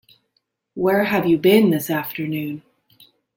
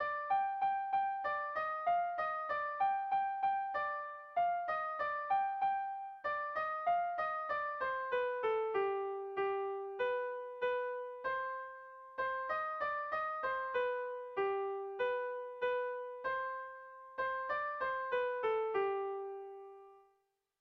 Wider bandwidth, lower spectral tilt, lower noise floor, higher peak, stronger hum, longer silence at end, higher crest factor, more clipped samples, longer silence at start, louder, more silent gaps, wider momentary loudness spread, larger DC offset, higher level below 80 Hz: first, 17 kHz vs 6 kHz; first, -6 dB/octave vs -0.5 dB/octave; second, -71 dBFS vs -79 dBFS; first, -2 dBFS vs -24 dBFS; neither; first, 0.8 s vs 0.6 s; about the same, 18 dB vs 14 dB; neither; first, 0.75 s vs 0 s; first, -19 LUFS vs -37 LUFS; neither; first, 16 LU vs 7 LU; neither; first, -60 dBFS vs -76 dBFS